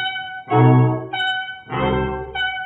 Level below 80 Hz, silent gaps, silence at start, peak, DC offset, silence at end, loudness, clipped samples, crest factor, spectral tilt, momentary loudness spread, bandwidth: -40 dBFS; none; 0 s; -2 dBFS; under 0.1%; 0 s; -19 LUFS; under 0.1%; 16 dB; -8.5 dB/octave; 11 LU; 4 kHz